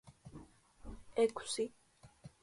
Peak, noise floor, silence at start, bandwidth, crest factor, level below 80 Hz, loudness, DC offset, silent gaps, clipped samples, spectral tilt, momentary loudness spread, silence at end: -20 dBFS; -59 dBFS; 0.05 s; 11.5 kHz; 20 dB; -62 dBFS; -37 LUFS; under 0.1%; none; under 0.1%; -3.5 dB/octave; 24 LU; 0.15 s